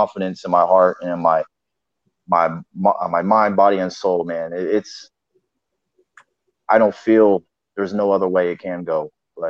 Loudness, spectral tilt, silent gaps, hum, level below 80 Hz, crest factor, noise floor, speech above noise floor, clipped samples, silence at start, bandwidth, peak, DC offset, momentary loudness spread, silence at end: -18 LUFS; -7 dB/octave; none; none; -66 dBFS; 18 dB; -81 dBFS; 63 dB; under 0.1%; 0 s; 7.4 kHz; -2 dBFS; under 0.1%; 11 LU; 0 s